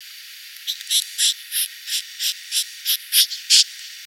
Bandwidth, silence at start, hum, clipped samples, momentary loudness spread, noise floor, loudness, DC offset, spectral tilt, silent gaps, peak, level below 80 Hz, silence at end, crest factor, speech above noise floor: 18 kHz; 0 s; none; under 0.1%; 15 LU; -39 dBFS; -19 LUFS; under 0.1%; 12 dB/octave; none; 0 dBFS; under -90 dBFS; 0 s; 22 dB; 16 dB